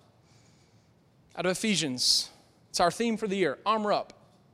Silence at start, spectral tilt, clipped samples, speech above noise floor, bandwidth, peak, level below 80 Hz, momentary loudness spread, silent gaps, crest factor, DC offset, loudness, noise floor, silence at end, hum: 1.35 s; -3 dB/octave; under 0.1%; 35 dB; 16 kHz; -10 dBFS; -66 dBFS; 12 LU; none; 20 dB; under 0.1%; -27 LUFS; -62 dBFS; 0.5 s; none